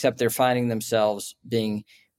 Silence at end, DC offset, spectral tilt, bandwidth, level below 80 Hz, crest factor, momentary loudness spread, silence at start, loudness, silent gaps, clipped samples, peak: 0.35 s; under 0.1%; -5 dB/octave; 16.5 kHz; -68 dBFS; 16 dB; 9 LU; 0 s; -25 LUFS; none; under 0.1%; -8 dBFS